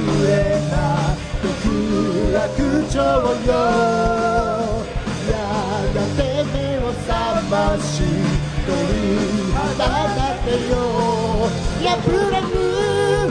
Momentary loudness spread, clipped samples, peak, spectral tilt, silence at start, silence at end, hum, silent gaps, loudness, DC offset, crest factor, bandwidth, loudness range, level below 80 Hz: 5 LU; under 0.1%; -4 dBFS; -6 dB/octave; 0 s; 0 s; none; none; -19 LUFS; under 0.1%; 14 dB; 10.5 kHz; 2 LU; -28 dBFS